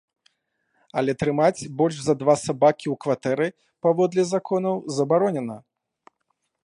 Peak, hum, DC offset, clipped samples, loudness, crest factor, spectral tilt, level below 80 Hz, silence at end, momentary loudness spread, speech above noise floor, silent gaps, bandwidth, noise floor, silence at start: -6 dBFS; none; under 0.1%; under 0.1%; -23 LUFS; 18 dB; -6 dB/octave; -62 dBFS; 1.05 s; 7 LU; 53 dB; none; 11 kHz; -75 dBFS; 0.95 s